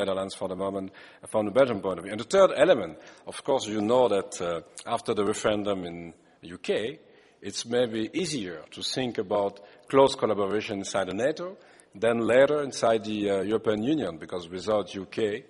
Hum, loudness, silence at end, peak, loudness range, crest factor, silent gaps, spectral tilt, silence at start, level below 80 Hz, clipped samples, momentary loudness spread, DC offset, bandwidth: none; -27 LUFS; 0.1 s; -6 dBFS; 6 LU; 22 dB; none; -4.5 dB/octave; 0 s; -64 dBFS; under 0.1%; 15 LU; under 0.1%; 11.5 kHz